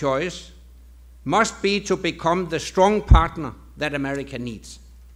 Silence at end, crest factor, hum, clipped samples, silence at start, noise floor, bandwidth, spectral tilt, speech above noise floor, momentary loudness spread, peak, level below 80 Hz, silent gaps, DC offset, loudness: 0.35 s; 22 dB; none; under 0.1%; 0 s; -46 dBFS; 12 kHz; -5.5 dB/octave; 25 dB; 17 LU; 0 dBFS; -28 dBFS; none; under 0.1%; -22 LUFS